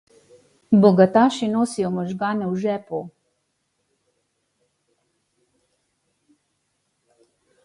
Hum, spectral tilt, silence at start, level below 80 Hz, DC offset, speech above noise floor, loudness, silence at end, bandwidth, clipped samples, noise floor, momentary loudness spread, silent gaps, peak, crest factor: none; -7 dB/octave; 0.7 s; -64 dBFS; under 0.1%; 54 dB; -20 LUFS; 4.55 s; 11.5 kHz; under 0.1%; -73 dBFS; 15 LU; none; -2 dBFS; 22 dB